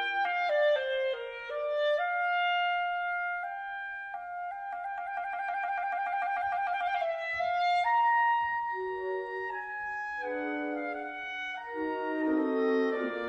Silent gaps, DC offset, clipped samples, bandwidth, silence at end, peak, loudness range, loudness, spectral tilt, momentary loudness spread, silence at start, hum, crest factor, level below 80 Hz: none; under 0.1%; under 0.1%; 8.4 kHz; 0 s; -18 dBFS; 6 LU; -31 LUFS; -4 dB/octave; 10 LU; 0 s; none; 14 dB; -70 dBFS